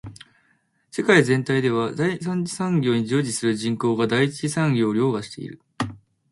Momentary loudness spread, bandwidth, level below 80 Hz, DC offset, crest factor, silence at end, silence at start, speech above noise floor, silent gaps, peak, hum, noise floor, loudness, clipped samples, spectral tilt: 13 LU; 11.5 kHz; -60 dBFS; under 0.1%; 20 dB; 0.35 s; 0.05 s; 44 dB; none; -2 dBFS; none; -65 dBFS; -22 LUFS; under 0.1%; -5.5 dB/octave